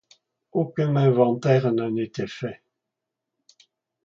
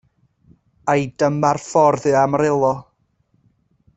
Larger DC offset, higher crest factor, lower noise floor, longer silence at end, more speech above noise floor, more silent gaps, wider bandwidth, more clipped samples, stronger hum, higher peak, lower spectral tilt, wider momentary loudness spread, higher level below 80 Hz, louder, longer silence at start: neither; about the same, 20 dB vs 16 dB; first, -84 dBFS vs -64 dBFS; first, 1.5 s vs 1.15 s; first, 62 dB vs 47 dB; neither; second, 7.2 kHz vs 8.2 kHz; neither; neither; about the same, -4 dBFS vs -2 dBFS; first, -8.5 dB/octave vs -6.5 dB/octave; first, 12 LU vs 5 LU; second, -66 dBFS vs -56 dBFS; second, -23 LUFS vs -18 LUFS; second, 0.55 s vs 0.85 s